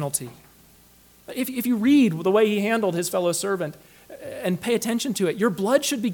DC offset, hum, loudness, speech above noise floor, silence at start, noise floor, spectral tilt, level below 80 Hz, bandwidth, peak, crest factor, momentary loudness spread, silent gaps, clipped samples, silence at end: under 0.1%; none; -23 LUFS; 31 dB; 0 s; -54 dBFS; -4.5 dB/octave; -64 dBFS; 19 kHz; -6 dBFS; 18 dB; 12 LU; none; under 0.1%; 0 s